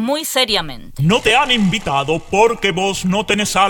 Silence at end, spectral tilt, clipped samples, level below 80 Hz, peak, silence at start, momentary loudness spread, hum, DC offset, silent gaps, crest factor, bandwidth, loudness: 0 s; -4 dB/octave; under 0.1%; -38 dBFS; 0 dBFS; 0 s; 6 LU; none; under 0.1%; none; 16 dB; 17.5 kHz; -15 LUFS